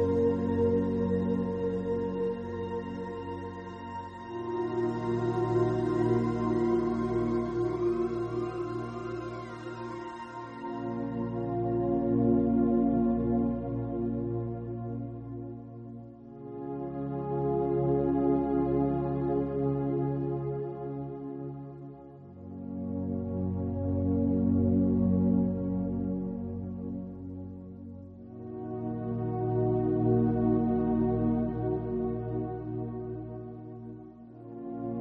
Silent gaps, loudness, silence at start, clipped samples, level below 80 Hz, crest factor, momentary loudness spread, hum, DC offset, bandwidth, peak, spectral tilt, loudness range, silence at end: none; -31 LUFS; 0 s; under 0.1%; -50 dBFS; 16 dB; 16 LU; none; under 0.1%; 7.4 kHz; -14 dBFS; -10 dB/octave; 8 LU; 0 s